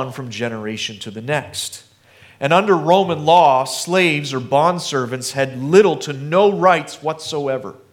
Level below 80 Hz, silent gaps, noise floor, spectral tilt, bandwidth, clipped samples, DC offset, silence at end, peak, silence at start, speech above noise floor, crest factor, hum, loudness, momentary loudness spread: -66 dBFS; none; -48 dBFS; -4.5 dB/octave; 17 kHz; under 0.1%; under 0.1%; 0.2 s; 0 dBFS; 0 s; 31 dB; 18 dB; none; -17 LUFS; 12 LU